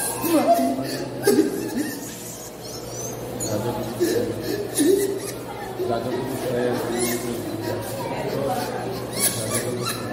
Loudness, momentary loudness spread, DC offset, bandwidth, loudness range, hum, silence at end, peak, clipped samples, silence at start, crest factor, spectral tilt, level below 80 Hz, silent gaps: -24 LUFS; 12 LU; under 0.1%; 16 kHz; 2 LU; none; 0 s; -4 dBFS; under 0.1%; 0 s; 20 dB; -4 dB/octave; -52 dBFS; none